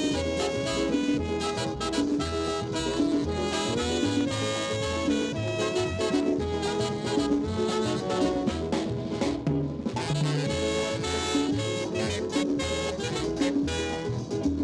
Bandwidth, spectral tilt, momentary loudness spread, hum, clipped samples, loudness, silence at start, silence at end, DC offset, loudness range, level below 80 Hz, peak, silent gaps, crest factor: 12 kHz; -5 dB/octave; 3 LU; none; under 0.1%; -28 LUFS; 0 s; 0 s; under 0.1%; 1 LU; -46 dBFS; -14 dBFS; none; 12 dB